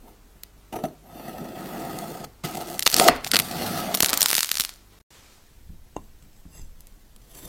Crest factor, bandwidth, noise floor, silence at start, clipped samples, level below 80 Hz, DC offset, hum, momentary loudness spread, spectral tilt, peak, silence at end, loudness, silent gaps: 28 dB; 17 kHz; -52 dBFS; 0.1 s; under 0.1%; -50 dBFS; under 0.1%; none; 24 LU; -1 dB/octave; 0 dBFS; 0 s; -22 LUFS; 5.03-5.10 s